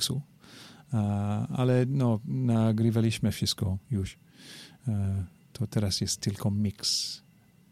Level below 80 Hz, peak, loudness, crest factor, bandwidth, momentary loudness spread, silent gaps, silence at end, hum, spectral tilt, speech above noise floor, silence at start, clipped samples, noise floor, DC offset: -56 dBFS; -12 dBFS; -29 LUFS; 16 dB; 15 kHz; 18 LU; none; 0.55 s; none; -5.5 dB/octave; 23 dB; 0 s; under 0.1%; -51 dBFS; under 0.1%